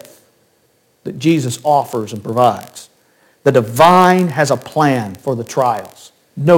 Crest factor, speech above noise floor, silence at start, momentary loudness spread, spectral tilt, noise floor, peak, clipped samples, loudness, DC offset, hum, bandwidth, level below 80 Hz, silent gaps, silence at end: 16 dB; 44 dB; 1.05 s; 15 LU; -6 dB/octave; -58 dBFS; 0 dBFS; under 0.1%; -14 LUFS; under 0.1%; none; 17 kHz; -58 dBFS; none; 0 s